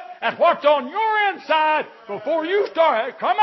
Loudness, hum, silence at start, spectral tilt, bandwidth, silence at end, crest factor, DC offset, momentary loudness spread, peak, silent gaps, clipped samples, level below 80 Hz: -19 LUFS; none; 0 s; -5 dB/octave; 6 kHz; 0 s; 16 dB; under 0.1%; 7 LU; -4 dBFS; none; under 0.1%; -82 dBFS